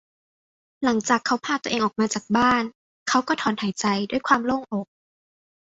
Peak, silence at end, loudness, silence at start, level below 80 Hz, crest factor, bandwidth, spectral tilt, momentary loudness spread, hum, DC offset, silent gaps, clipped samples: -4 dBFS; 0.9 s; -23 LUFS; 0.8 s; -60 dBFS; 22 dB; 8 kHz; -3.5 dB/octave; 9 LU; none; under 0.1%; 2.75-3.06 s; under 0.1%